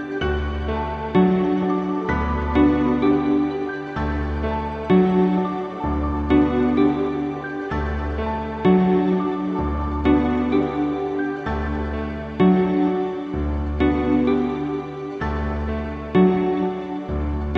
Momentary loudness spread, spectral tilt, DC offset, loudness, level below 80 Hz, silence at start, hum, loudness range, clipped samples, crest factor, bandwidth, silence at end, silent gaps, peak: 9 LU; -9 dB/octave; under 0.1%; -21 LUFS; -32 dBFS; 0 s; none; 2 LU; under 0.1%; 16 dB; 6.4 kHz; 0 s; none; -6 dBFS